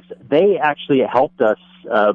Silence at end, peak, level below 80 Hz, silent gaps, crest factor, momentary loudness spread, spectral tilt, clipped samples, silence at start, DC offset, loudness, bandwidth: 0 s; -4 dBFS; -62 dBFS; none; 14 dB; 5 LU; -8 dB/octave; under 0.1%; 0.1 s; under 0.1%; -17 LUFS; 5 kHz